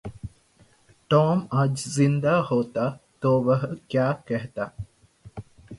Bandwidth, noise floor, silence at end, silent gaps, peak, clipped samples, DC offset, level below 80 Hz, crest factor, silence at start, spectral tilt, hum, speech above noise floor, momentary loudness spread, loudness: 11.5 kHz; -59 dBFS; 0 s; none; -6 dBFS; under 0.1%; under 0.1%; -54 dBFS; 18 dB; 0.05 s; -7 dB/octave; none; 36 dB; 22 LU; -24 LUFS